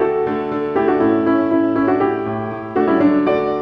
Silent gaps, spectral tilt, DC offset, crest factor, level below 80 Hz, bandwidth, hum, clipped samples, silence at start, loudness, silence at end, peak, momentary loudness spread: none; -9.5 dB/octave; under 0.1%; 12 dB; -52 dBFS; 5.4 kHz; none; under 0.1%; 0 s; -17 LUFS; 0 s; -4 dBFS; 7 LU